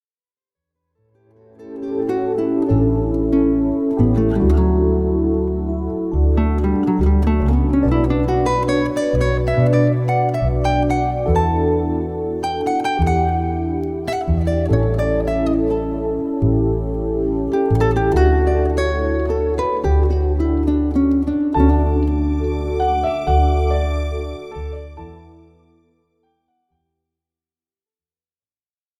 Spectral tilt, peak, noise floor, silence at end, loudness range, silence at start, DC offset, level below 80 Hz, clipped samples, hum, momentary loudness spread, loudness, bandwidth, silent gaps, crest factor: -8.5 dB/octave; -2 dBFS; under -90 dBFS; 3.8 s; 4 LU; 1.6 s; under 0.1%; -24 dBFS; under 0.1%; none; 7 LU; -18 LUFS; 9.6 kHz; none; 16 dB